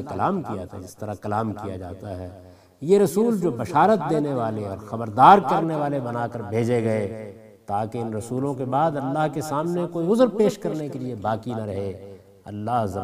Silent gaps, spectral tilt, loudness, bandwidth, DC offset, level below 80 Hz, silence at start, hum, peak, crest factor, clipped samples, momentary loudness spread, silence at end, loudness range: none; -7 dB/octave; -23 LUFS; 15.5 kHz; under 0.1%; -62 dBFS; 0 s; none; 0 dBFS; 22 dB; under 0.1%; 16 LU; 0 s; 6 LU